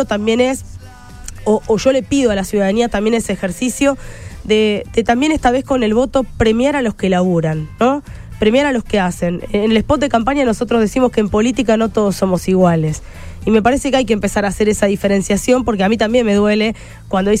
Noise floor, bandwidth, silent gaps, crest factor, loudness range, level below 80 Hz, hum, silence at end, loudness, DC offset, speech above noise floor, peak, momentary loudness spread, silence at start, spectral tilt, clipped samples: -34 dBFS; 15.5 kHz; none; 14 dB; 2 LU; -34 dBFS; none; 0 s; -15 LUFS; under 0.1%; 20 dB; -2 dBFS; 7 LU; 0 s; -5.5 dB/octave; under 0.1%